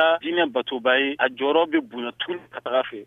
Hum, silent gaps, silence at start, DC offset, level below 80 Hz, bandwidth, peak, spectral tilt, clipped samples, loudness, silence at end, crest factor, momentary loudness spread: none; none; 0 s; under 0.1%; -72 dBFS; 3.9 kHz; -6 dBFS; -5.5 dB/octave; under 0.1%; -23 LUFS; 0 s; 18 dB; 10 LU